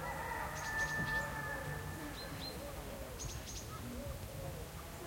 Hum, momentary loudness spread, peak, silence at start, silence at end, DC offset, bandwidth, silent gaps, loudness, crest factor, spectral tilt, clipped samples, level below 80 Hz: none; 9 LU; -26 dBFS; 0 s; 0 s; under 0.1%; 16.5 kHz; none; -42 LUFS; 16 dB; -4 dB/octave; under 0.1%; -52 dBFS